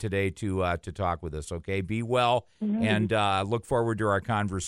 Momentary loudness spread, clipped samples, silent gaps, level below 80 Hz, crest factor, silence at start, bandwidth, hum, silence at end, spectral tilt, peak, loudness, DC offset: 7 LU; under 0.1%; none; -50 dBFS; 16 dB; 0 s; 12 kHz; none; 0 s; -6 dB/octave; -12 dBFS; -28 LUFS; under 0.1%